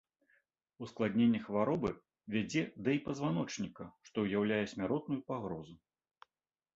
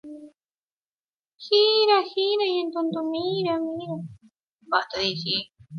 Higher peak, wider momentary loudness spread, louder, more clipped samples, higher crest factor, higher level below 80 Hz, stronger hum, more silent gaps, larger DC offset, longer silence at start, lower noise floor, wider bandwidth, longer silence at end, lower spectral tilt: second, -18 dBFS vs -6 dBFS; about the same, 15 LU vs 16 LU; second, -36 LUFS vs -23 LUFS; neither; about the same, 18 dB vs 20 dB; about the same, -68 dBFS vs -68 dBFS; neither; second, none vs 0.71-0.96 s, 1.04-1.23 s, 4.53-4.59 s; neither; first, 0.8 s vs 0.05 s; about the same, under -90 dBFS vs under -90 dBFS; first, 7.8 kHz vs 6.8 kHz; first, 1 s vs 0 s; about the same, -6 dB/octave vs -5 dB/octave